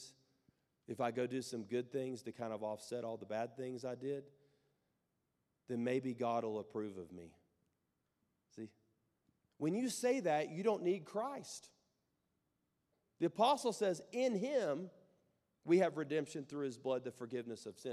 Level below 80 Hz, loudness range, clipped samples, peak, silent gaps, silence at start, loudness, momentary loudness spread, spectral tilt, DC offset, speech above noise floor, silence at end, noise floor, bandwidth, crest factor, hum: -90 dBFS; 8 LU; under 0.1%; -20 dBFS; none; 0 s; -40 LUFS; 16 LU; -5 dB/octave; under 0.1%; 46 dB; 0 s; -85 dBFS; 14 kHz; 22 dB; none